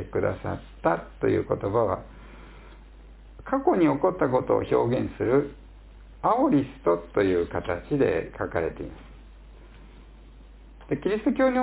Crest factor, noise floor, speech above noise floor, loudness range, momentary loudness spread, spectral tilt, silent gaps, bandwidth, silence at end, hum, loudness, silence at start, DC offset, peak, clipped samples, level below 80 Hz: 18 dB; -47 dBFS; 23 dB; 6 LU; 11 LU; -11.5 dB/octave; none; 4 kHz; 0 s; none; -26 LUFS; 0 s; under 0.1%; -8 dBFS; under 0.1%; -46 dBFS